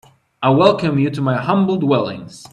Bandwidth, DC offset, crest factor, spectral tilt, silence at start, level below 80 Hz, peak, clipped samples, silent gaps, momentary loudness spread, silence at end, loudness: 11.5 kHz; under 0.1%; 16 dB; -7.5 dB/octave; 0.4 s; -56 dBFS; 0 dBFS; under 0.1%; none; 7 LU; 0.05 s; -16 LUFS